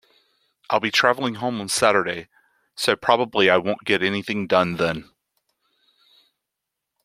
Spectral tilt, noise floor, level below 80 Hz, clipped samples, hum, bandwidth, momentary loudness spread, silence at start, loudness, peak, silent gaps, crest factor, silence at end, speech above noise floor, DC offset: -3.5 dB/octave; -83 dBFS; -62 dBFS; under 0.1%; none; 16 kHz; 9 LU; 0.7 s; -21 LUFS; -2 dBFS; none; 22 dB; 2 s; 62 dB; under 0.1%